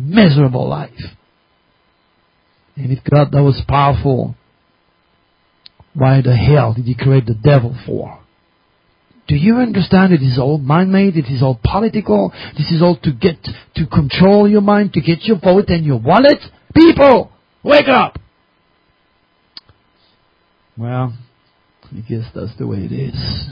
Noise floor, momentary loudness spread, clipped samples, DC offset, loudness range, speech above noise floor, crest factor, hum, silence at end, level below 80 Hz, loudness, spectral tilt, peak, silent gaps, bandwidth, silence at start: -58 dBFS; 15 LU; under 0.1%; under 0.1%; 14 LU; 46 dB; 14 dB; none; 0 s; -36 dBFS; -13 LUFS; -10 dB/octave; 0 dBFS; none; 5.4 kHz; 0 s